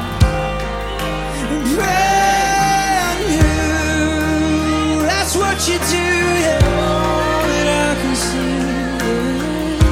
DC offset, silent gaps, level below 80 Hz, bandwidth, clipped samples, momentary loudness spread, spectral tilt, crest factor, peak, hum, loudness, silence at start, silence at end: under 0.1%; none; -26 dBFS; 16.5 kHz; under 0.1%; 6 LU; -4.5 dB/octave; 16 dB; 0 dBFS; none; -16 LUFS; 0 s; 0 s